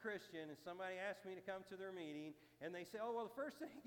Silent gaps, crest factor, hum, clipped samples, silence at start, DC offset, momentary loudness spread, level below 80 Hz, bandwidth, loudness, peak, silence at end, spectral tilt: none; 16 dB; none; under 0.1%; 0 s; under 0.1%; 7 LU; -88 dBFS; 18 kHz; -51 LUFS; -34 dBFS; 0 s; -5 dB/octave